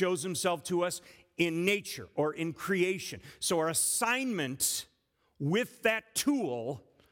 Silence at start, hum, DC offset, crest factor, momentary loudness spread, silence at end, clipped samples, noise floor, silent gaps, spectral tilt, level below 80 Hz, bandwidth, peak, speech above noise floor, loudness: 0 s; none; under 0.1%; 18 dB; 10 LU; 0.3 s; under 0.1%; -74 dBFS; none; -3.5 dB/octave; -72 dBFS; 18 kHz; -14 dBFS; 42 dB; -31 LUFS